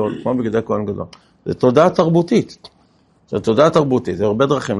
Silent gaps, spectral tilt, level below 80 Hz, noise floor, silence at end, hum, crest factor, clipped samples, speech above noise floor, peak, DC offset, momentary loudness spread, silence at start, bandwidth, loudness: none; -7 dB/octave; -52 dBFS; -55 dBFS; 0 s; none; 16 dB; under 0.1%; 39 dB; 0 dBFS; under 0.1%; 14 LU; 0 s; 11.5 kHz; -16 LUFS